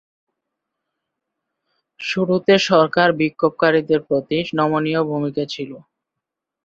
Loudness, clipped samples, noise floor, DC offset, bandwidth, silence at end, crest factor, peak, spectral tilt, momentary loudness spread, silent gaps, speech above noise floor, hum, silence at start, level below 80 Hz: -18 LUFS; under 0.1%; -83 dBFS; under 0.1%; 7.8 kHz; 0.85 s; 18 dB; -2 dBFS; -5.5 dB/octave; 11 LU; none; 65 dB; none; 2 s; -60 dBFS